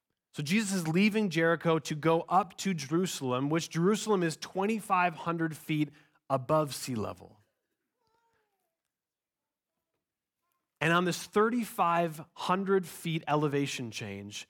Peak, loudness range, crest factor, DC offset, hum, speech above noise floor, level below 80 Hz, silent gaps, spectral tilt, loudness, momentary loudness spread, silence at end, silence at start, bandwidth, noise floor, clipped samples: -12 dBFS; 7 LU; 18 dB; under 0.1%; none; over 60 dB; -74 dBFS; none; -5 dB/octave; -30 LUFS; 9 LU; 0.05 s; 0.35 s; 18 kHz; under -90 dBFS; under 0.1%